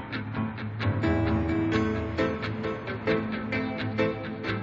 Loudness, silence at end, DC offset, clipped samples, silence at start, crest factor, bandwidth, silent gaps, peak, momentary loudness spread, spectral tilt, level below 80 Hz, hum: -29 LUFS; 0 s; under 0.1%; under 0.1%; 0 s; 18 dB; 7.4 kHz; none; -10 dBFS; 6 LU; -8 dB/octave; -44 dBFS; none